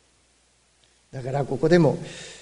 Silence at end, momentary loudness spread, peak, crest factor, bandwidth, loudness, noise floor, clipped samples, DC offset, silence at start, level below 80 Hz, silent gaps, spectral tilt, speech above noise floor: 0.05 s; 19 LU; -4 dBFS; 20 dB; 10.5 kHz; -22 LUFS; -63 dBFS; under 0.1%; under 0.1%; 1.15 s; -52 dBFS; none; -7 dB/octave; 40 dB